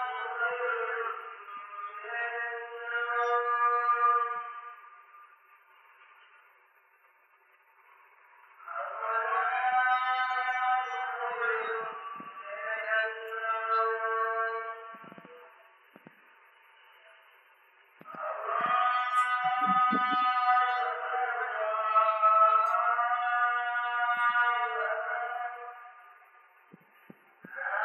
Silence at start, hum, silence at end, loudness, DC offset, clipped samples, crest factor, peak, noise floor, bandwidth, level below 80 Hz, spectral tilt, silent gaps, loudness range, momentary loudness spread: 0 s; none; 0 s; -29 LUFS; under 0.1%; under 0.1%; 18 dB; -12 dBFS; -64 dBFS; 10 kHz; under -90 dBFS; -4 dB/octave; none; 11 LU; 16 LU